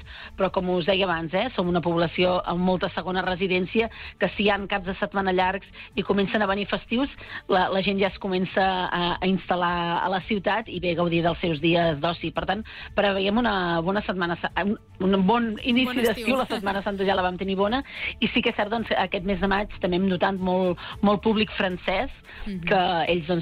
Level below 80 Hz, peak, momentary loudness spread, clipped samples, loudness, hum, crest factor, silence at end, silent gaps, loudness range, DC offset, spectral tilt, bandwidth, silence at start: -46 dBFS; -10 dBFS; 5 LU; under 0.1%; -24 LUFS; none; 14 dB; 0 s; none; 1 LU; under 0.1%; -7 dB/octave; 15.5 kHz; 0 s